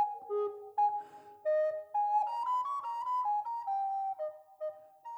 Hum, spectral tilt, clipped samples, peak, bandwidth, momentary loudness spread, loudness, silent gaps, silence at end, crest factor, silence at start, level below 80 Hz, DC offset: none; -3.5 dB/octave; under 0.1%; -22 dBFS; 8.6 kHz; 11 LU; -34 LUFS; none; 0 s; 12 dB; 0 s; under -90 dBFS; under 0.1%